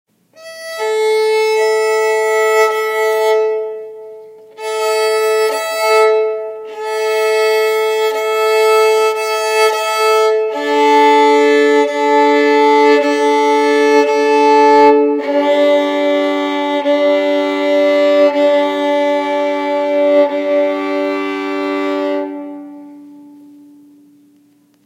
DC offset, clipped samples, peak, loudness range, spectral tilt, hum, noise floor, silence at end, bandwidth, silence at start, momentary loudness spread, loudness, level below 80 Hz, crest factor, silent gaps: under 0.1%; under 0.1%; 0 dBFS; 6 LU; -2 dB/octave; none; -52 dBFS; 1.65 s; 16 kHz; 0.4 s; 9 LU; -13 LUFS; -82 dBFS; 14 dB; none